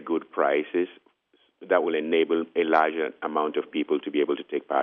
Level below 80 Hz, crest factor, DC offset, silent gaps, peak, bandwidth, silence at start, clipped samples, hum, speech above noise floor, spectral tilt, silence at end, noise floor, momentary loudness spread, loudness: -80 dBFS; 20 dB; under 0.1%; none; -6 dBFS; 5.4 kHz; 0 s; under 0.1%; none; 42 dB; -2 dB/octave; 0 s; -67 dBFS; 7 LU; -26 LUFS